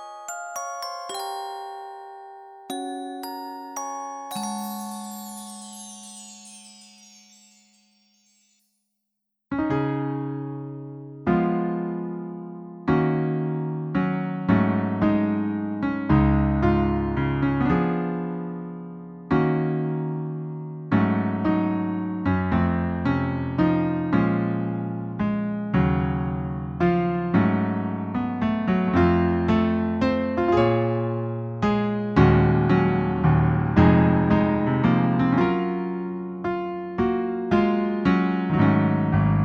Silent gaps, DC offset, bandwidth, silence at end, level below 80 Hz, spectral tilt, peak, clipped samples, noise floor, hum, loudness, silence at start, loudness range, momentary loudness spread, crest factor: none; under 0.1%; 15 kHz; 0 s; -40 dBFS; -7.5 dB/octave; -4 dBFS; under 0.1%; -80 dBFS; none; -23 LUFS; 0 s; 13 LU; 15 LU; 20 dB